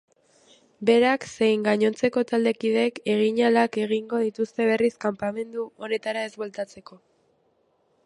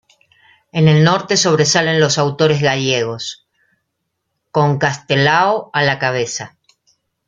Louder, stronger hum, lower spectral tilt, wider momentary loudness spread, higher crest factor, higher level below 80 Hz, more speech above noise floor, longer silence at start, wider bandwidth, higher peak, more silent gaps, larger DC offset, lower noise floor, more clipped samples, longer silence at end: second, -24 LUFS vs -15 LUFS; neither; about the same, -5.5 dB/octave vs -4.5 dB/octave; about the same, 12 LU vs 11 LU; about the same, 18 dB vs 16 dB; second, -70 dBFS vs -56 dBFS; second, 44 dB vs 59 dB; about the same, 0.8 s vs 0.75 s; first, 11.5 kHz vs 8.8 kHz; second, -6 dBFS vs 0 dBFS; neither; neither; second, -67 dBFS vs -73 dBFS; neither; first, 1.1 s vs 0.8 s